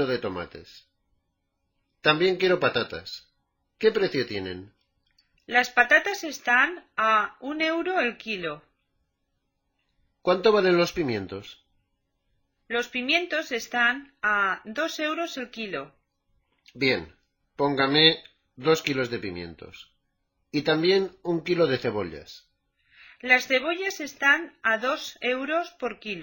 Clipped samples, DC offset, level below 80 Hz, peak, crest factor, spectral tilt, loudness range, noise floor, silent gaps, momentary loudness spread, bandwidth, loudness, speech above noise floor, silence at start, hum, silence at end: under 0.1%; under 0.1%; -62 dBFS; -2 dBFS; 24 dB; -4 dB/octave; 4 LU; -77 dBFS; none; 15 LU; 17 kHz; -24 LUFS; 52 dB; 0 s; none; 0 s